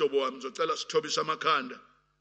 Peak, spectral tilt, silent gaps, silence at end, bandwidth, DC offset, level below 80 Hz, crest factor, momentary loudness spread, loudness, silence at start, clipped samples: -12 dBFS; -2.5 dB/octave; none; 0.4 s; 8.8 kHz; under 0.1%; -80 dBFS; 18 dB; 9 LU; -29 LUFS; 0 s; under 0.1%